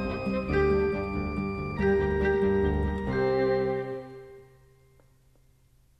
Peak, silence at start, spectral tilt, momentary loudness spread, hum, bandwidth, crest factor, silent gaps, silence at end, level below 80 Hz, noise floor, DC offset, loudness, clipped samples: -14 dBFS; 0 s; -8.5 dB/octave; 8 LU; none; 6 kHz; 14 dB; none; 1.55 s; -40 dBFS; -62 dBFS; under 0.1%; -27 LUFS; under 0.1%